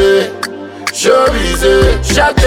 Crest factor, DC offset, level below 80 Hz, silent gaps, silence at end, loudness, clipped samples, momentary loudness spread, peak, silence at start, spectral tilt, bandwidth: 10 dB; under 0.1%; -20 dBFS; none; 0 s; -11 LUFS; under 0.1%; 11 LU; 0 dBFS; 0 s; -4 dB/octave; 16.5 kHz